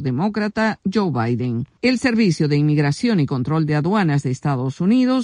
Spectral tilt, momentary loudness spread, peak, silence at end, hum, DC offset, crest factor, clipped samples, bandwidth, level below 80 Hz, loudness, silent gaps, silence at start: -7 dB/octave; 4 LU; -4 dBFS; 0 s; none; under 0.1%; 14 dB; under 0.1%; 10 kHz; -54 dBFS; -19 LUFS; none; 0 s